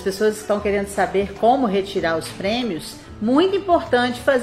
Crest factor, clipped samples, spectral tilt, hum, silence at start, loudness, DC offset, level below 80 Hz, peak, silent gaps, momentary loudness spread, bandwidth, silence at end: 16 dB; under 0.1%; -5 dB/octave; none; 0 s; -20 LUFS; under 0.1%; -46 dBFS; -4 dBFS; none; 6 LU; 15 kHz; 0 s